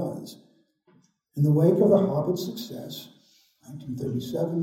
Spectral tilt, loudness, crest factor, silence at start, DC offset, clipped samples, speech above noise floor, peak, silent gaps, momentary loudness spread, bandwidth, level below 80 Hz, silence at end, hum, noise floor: -8.5 dB/octave; -24 LUFS; 18 dB; 0 s; under 0.1%; under 0.1%; 39 dB; -8 dBFS; none; 21 LU; 17 kHz; -66 dBFS; 0 s; none; -63 dBFS